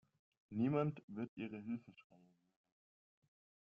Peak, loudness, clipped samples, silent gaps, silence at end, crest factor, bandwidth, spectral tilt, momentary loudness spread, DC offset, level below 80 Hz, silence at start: -24 dBFS; -43 LUFS; under 0.1%; 1.03-1.08 s, 1.28-1.37 s; 1.6 s; 20 dB; 5.2 kHz; -8 dB/octave; 11 LU; under 0.1%; -82 dBFS; 0.5 s